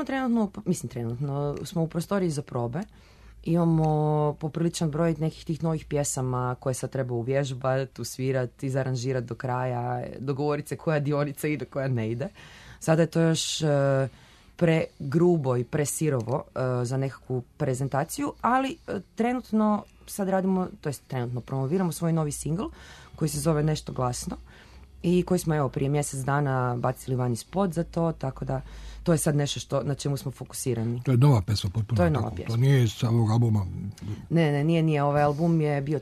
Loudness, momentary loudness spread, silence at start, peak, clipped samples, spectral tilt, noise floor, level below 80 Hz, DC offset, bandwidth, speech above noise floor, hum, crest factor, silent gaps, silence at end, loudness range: -27 LUFS; 9 LU; 0 s; -10 dBFS; under 0.1%; -6.5 dB/octave; -49 dBFS; -50 dBFS; under 0.1%; 13.5 kHz; 23 dB; none; 18 dB; none; 0 s; 4 LU